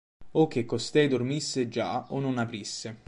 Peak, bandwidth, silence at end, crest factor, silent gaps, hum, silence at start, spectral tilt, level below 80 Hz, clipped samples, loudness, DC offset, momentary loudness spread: -10 dBFS; 11 kHz; 0.1 s; 18 dB; none; none; 0.2 s; -5 dB/octave; -64 dBFS; under 0.1%; -28 LUFS; under 0.1%; 7 LU